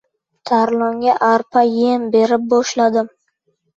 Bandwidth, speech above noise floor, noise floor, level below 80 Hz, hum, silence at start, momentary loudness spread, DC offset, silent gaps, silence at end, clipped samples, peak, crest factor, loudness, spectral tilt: 7.8 kHz; 52 dB; -67 dBFS; -64 dBFS; none; 0.45 s; 5 LU; under 0.1%; none; 0.7 s; under 0.1%; -2 dBFS; 14 dB; -16 LUFS; -4.5 dB/octave